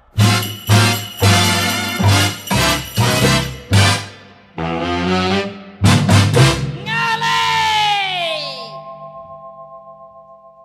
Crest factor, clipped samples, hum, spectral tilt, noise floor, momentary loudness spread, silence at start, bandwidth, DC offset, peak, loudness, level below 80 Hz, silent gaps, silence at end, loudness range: 16 dB; under 0.1%; none; -4 dB/octave; -42 dBFS; 20 LU; 0.15 s; 15 kHz; under 0.1%; 0 dBFS; -15 LUFS; -38 dBFS; none; 0.3 s; 4 LU